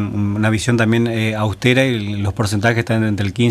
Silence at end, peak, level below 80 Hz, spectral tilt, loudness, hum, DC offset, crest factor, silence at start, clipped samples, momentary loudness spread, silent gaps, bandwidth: 0 s; 0 dBFS; -44 dBFS; -6 dB/octave; -17 LUFS; none; under 0.1%; 16 dB; 0 s; under 0.1%; 5 LU; none; 14 kHz